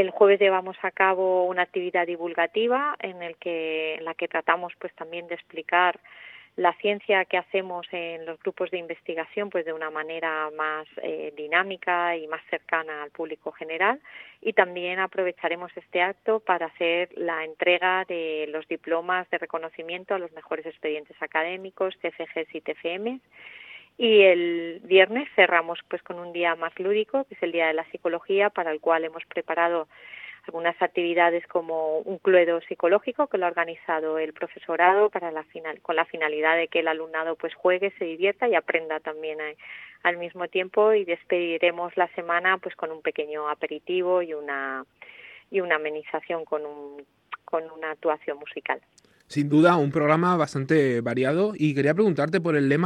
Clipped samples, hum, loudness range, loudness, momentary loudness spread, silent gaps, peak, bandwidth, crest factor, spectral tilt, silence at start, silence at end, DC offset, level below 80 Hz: under 0.1%; none; 8 LU; -25 LUFS; 13 LU; none; -2 dBFS; 9.8 kHz; 24 dB; -6.5 dB/octave; 0 s; 0 s; under 0.1%; -78 dBFS